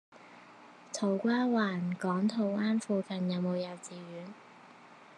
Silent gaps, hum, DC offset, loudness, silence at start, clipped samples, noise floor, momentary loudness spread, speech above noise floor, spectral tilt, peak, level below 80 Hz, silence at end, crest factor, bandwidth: none; 60 Hz at -50 dBFS; under 0.1%; -32 LUFS; 0.15 s; under 0.1%; -55 dBFS; 20 LU; 23 dB; -6 dB/octave; -18 dBFS; under -90 dBFS; 0.05 s; 16 dB; 10.5 kHz